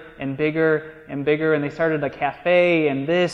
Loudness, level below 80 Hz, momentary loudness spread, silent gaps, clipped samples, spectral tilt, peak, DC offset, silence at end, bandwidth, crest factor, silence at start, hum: -21 LUFS; -56 dBFS; 8 LU; none; under 0.1%; -7 dB/octave; -6 dBFS; under 0.1%; 0 s; 7.6 kHz; 16 dB; 0 s; none